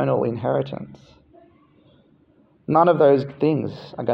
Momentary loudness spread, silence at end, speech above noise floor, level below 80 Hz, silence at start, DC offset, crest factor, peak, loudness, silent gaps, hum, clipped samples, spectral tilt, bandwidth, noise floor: 19 LU; 0 s; 37 dB; -62 dBFS; 0 s; under 0.1%; 18 dB; -4 dBFS; -20 LUFS; none; none; under 0.1%; -10 dB/octave; 6 kHz; -58 dBFS